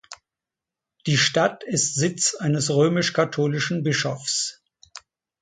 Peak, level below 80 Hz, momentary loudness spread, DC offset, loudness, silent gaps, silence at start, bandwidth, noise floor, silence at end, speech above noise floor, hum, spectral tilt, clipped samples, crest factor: -6 dBFS; -64 dBFS; 5 LU; under 0.1%; -22 LUFS; none; 0.1 s; 9.6 kHz; -88 dBFS; 0.45 s; 66 dB; none; -3.5 dB/octave; under 0.1%; 18 dB